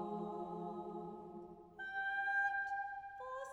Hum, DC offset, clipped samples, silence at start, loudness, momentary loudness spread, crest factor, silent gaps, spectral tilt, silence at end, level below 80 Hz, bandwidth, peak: none; under 0.1%; under 0.1%; 0 s; -42 LUFS; 16 LU; 16 dB; none; -6 dB/octave; 0 s; -76 dBFS; 11 kHz; -28 dBFS